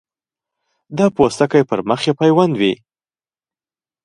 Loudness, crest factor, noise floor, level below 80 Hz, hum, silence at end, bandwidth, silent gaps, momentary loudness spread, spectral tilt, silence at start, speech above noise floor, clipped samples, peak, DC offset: -15 LUFS; 18 dB; under -90 dBFS; -56 dBFS; none; 1.3 s; 11.5 kHz; none; 6 LU; -6 dB/octave; 0.9 s; over 75 dB; under 0.1%; 0 dBFS; under 0.1%